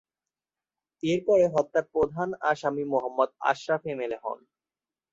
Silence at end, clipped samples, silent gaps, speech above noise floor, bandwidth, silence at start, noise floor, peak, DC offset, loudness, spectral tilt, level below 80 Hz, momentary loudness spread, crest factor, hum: 0.75 s; under 0.1%; none; over 64 dB; 7.8 kHz; 1.05 s; under -90 dBFS; -8 dBFS; under 0.1%; -27 LUFS; -6 dB/octave; -64 dBFS; 11 LU; 20 dB; none